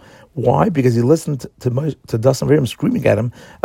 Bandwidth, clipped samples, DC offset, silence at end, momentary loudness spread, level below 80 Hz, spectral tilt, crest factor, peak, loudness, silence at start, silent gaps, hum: 16.5 kHz; under 0.1%; under 0.1%; 0.2 s; 8 LU; -48 dBFS; -7 dB/octave; 16 dB; 0 dBFS; -17 LUFS; 0.35 s; none; none